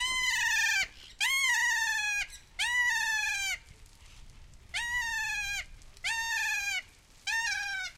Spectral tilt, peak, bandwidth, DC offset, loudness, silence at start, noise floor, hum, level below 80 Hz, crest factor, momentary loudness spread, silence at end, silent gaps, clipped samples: 2.5 dB/octave; -16 dBFS; 16 kHz; under 0.1%; -29 LUFS; 0 s; -53 dBFS; none; -54 dBFS; 16 dB; 11 LU; 0.05 s; none; under 0.1%